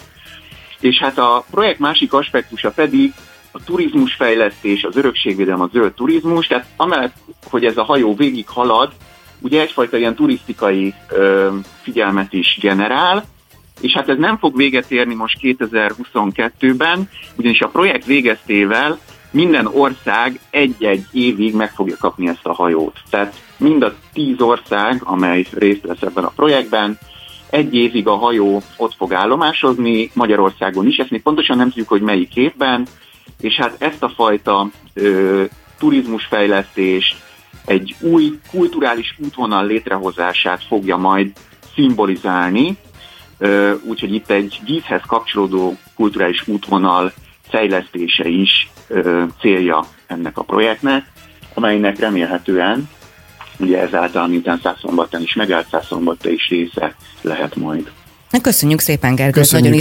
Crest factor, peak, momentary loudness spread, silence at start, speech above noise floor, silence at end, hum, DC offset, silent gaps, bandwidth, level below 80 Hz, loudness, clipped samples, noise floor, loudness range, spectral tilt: 16 dB; 0 dBFS; 7 LU; 0.25 s; 25 dB; 0 s; none; under 0.1%; none; 17 kHz; -50 dBFS; -15 LUFS; under 0.1%; -40 dBFS; 3 LU; -4.5 dB/octave